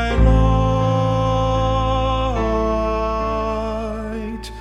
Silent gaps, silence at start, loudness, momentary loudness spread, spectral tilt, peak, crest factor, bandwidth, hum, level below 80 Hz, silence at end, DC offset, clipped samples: none; 0 s; -19 LUFS; 10 LU; -7.5 dB/octave; -2 dBFS; 16 dB; 8.2 kHz; none; -22 dBFS; 0 s; under 0.1%; under 0.1%